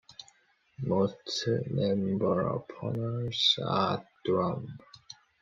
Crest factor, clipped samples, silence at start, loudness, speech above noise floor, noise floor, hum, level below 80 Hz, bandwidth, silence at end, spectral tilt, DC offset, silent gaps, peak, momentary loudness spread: 18 dB; under 0.1%; 0.1 s; -30 LUFS; 35 dB; -65 dBFS; none; -66 dBFS; 7.6 kHz; 0.3 s; -6 dB/octave; under 0.1%; none; -12 dBFS; 23 LU